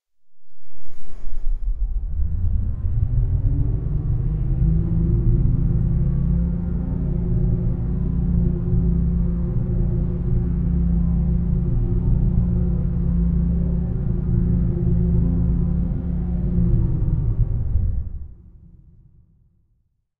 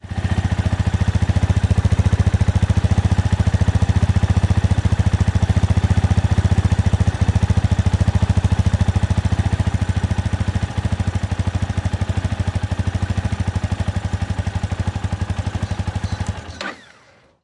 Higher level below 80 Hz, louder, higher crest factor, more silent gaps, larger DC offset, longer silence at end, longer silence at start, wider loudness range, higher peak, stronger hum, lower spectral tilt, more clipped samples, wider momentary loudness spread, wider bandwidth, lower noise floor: about the same, -22 dBFS vs -26 dBFS; second, -22 LUFS vs -19 LUFS; about the same, 14 dB vs 14 dB; neither; neither; first, 1.5 s vs 0.65 s; first, 0.3 s vs 0.05 s; about the same, 4 LU vs 6 LU; about the same, -6 dBFS vs -4 dBFS; neither; first, -13.5 dB/octave vs -7 dB/octave; neither; about the same, 5 LU vs 7 LU; second, 2.2 kHz vs 11 kHz; first, -66 dBFS vs -51 dBFS